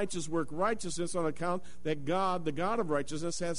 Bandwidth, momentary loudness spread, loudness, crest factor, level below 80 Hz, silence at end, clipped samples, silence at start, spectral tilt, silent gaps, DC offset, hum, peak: 11 kHz; 5 LU; -33 LUFS; 14 dB; -58 dBFS; 0 s; under 0.1%; 0 s; -5 dB/octave; none; 2%; none; -18 dBFS